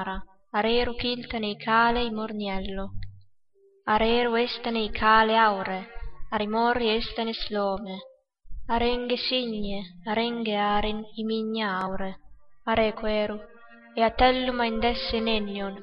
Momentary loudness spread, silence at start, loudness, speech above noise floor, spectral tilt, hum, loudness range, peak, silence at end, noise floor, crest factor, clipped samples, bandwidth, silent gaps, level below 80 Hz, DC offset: 14 LU; 0 s; -26 LUFS; 36 dB; -2 dB/octave; none; 5 LU; -6 dBFS; 0 s; -62 dBFS; 20 dB; under 0.1%; 5.8 kHz; none; -42 dBFS; under 0.1%